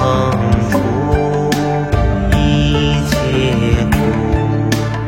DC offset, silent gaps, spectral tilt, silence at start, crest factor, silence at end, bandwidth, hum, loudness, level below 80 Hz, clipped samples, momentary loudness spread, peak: under 0.1%; none; -6.5 dB/octave; 0 s; 12 dB; 0 s; 16.5 kHz; none; -15 LUFS; -22 dBFS; under 0.1%; 2 LU; 0 dBFS